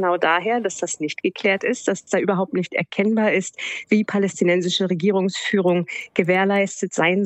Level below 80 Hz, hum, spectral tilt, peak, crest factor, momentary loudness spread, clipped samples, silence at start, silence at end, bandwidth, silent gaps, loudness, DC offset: -72 dBFS; none; -4.5 dB/octave; -2 dBFS; 18 dB; 6 LU; under 0.1%; 0 s; 0 s; 8.6 kHz; none; -21 LUFS; under 0.1%